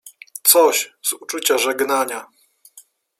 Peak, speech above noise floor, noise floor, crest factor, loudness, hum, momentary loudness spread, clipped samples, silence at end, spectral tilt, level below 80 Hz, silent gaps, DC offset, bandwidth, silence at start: 0 dBFS; 32 dB; -50 dBFS; 20 dB; -17 LUFS; none; 13 LU; under 0.1%; 0.4 s; 0.5 dB/octave; -74 dBFS; none; under 0.1%; 16.5 kHz; 0.05 s